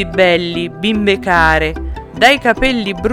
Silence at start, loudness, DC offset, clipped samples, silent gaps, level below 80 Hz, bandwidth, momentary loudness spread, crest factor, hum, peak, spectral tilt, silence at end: 0 s; -13 LUFS; under 0.1%; under 0.1%; none; -28 dBFS; 16.5 kHz; 10 LU; 14 dB; none; 0 dBFS; -5 dB/octave; 0 s